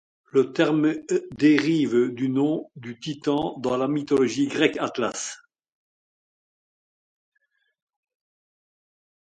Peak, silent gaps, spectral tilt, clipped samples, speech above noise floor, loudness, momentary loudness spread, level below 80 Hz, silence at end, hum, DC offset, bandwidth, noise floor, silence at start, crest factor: -4 dBFS; none; -5.5 dB/octave; under 0.1%; over 67 dB; -23 LUFS; 11 LU; -66 dBFS; 4 s; none; under 0.1%; 9.2 kHz; under -90 dBFS; 0.35 s; 20 dB